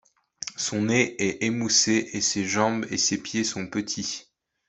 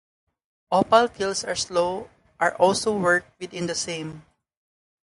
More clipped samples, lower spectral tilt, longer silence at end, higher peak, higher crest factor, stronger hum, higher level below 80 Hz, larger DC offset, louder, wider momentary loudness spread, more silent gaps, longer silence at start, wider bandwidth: neither; about the same, -2.5 dB/octave vs -3.5 dB/octave; second, 0.45 s vs 0.8 s; about the same, -6 dBFS vs -4 dBFS; about the same, 20 dB vs 20 dB; neither; second, -64 dBFS vs -58 dBFS; neither; about the same, -24 LUFS vs -23 LUFS; second, 10 LU vs 13 LU; neither; second, 0.4 s vs 0.7 s; second, 8.4 kHz vs 11.5 kHz